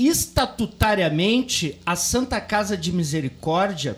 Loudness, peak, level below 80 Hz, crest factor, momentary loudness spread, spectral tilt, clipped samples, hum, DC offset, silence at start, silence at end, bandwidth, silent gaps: -22 LUFS; -6 dBFS; -38 dBFS; 16 dB; 5 LU; -4 dB/octave; under 0.1%; none; under 0.1%; 0 s; 0 s; over 20 kHz; none